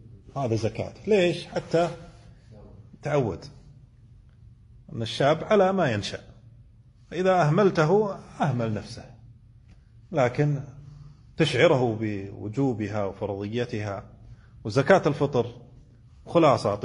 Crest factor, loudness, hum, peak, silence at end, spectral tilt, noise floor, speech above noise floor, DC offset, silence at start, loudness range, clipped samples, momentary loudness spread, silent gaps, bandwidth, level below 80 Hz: 22 dB; -25 LUFS; none; -6 dBFS; 0 s; -6.5 dB/octave; -53 dBFS; 29 dB; under 0.1%; 0.1 s; 5 LU; under 0.1%; 17 LU; none; 10.5 kHz; -54 dBFS